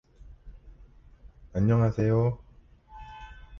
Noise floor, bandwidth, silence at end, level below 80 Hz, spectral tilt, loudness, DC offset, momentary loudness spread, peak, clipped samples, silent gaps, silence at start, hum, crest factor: -54 dBFS; 6.4 kHz; 0 s; -48 dBFS; -10 dB/octave; -26 LUFS; under 0.1%; 23 LU; -14 dBFS; under 0.1%; none; 0.25 s; none; 16 dB